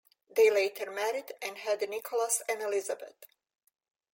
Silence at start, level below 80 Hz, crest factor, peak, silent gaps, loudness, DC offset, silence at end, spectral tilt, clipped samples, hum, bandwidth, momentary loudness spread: 0.35 s; -86 dBFS; 18 dB; -14 dBFS; none; -31 LUFS; under 0.1%; 0.9 s; 0 dB/octave; under 0.1%; none; 17 kHz; 14 LU